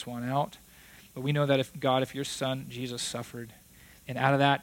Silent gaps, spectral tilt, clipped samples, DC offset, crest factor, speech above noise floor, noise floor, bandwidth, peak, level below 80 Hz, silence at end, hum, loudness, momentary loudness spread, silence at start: none; -5 dB/octave; under 0.1%; under 0.1%; 22 dB; 25 dB; -54 dBFS; 17 kHz; -10 dBFS; -64 dBFS; 0 s; none; -30 LUFS; 18 LU; 0 s